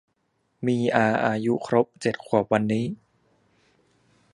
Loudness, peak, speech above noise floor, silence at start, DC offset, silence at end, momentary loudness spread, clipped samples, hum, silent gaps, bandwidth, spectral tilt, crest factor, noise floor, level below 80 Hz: -24 LUFS; -2 dBFS; 49 dB; 0.6 s; under 0.1%; 1.4 s; 8 LU; under 0.1%; none; none; 11 kHz; -7 dB/octave; 24 dB; -72 dBFS; -64 dBFS